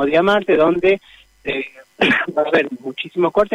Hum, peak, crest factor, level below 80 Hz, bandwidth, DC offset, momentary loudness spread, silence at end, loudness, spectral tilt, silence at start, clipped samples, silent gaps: none; -4 dBFS; 14 dB; -50 dBFS; 11 kHz; under 0.1%; 11 LU; 0 s; -17 LUFS; -6 dB/octave; 0 s; under 0.1%; none